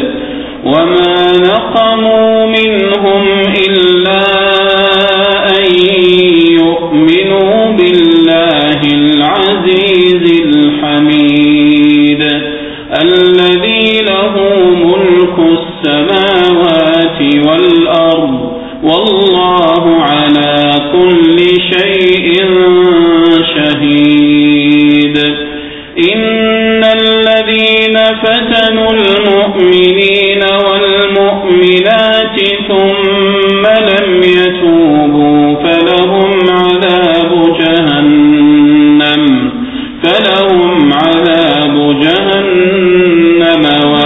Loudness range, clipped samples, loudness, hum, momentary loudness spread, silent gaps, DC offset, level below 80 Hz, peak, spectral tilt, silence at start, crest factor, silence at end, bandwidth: 1 LU; 0.3%; -7 LUFS; none; 4 LU; none; 0.3%; -40 dBFS; 0 dBFS; -7 dB/octave; 0 s; 8 dB; 0 s; 4.1 kHz